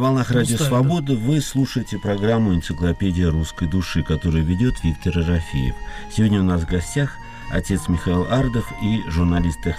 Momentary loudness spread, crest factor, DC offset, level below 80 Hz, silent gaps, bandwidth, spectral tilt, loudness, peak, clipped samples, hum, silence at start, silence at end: 6 LU; 12 dB; under 0.1%; -32 dBFS; none; 15.5 kHz; -6.5 dB/octave; -21 LUFS; -8 dBFS; under 0.1%; none; 0 s; 0 s